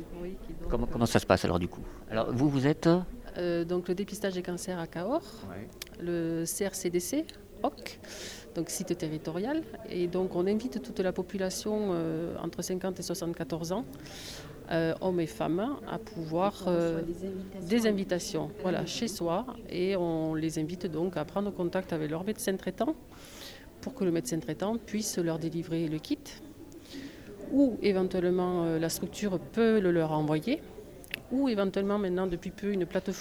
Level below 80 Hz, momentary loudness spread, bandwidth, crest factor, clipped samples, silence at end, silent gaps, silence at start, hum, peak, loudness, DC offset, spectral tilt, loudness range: -50 dBFS; 15 LU; over 20 kHz; 24 dB; under 0.1%; 0 s; none; 0 s; none; -8 dBFS; -31 LUFS; under 0.1%; -5.5 dB/octave; 5 LU